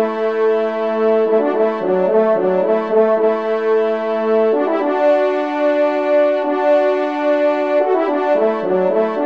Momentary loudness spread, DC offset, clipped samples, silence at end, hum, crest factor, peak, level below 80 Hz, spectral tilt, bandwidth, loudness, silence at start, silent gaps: 3 LU; 0.3%; under 0.1%; 0 s; none; 12 dB; -4 dBFS; -68 dBFS; -7.5 dB/octave; 6.6 kHz; -16 LUFS; 0 s; none